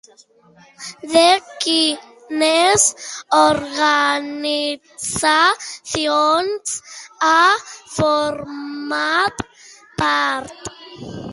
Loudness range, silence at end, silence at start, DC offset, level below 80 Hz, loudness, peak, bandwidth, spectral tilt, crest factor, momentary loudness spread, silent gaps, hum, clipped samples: 4 LU; 0 s; 0.8 s; under 0.1%; -52 dBFS; -17 LUFS; 0 dBFS; 11.5 kHz; -2 dB/octave; 18 dB; 19 LU; none; none; under 0.1%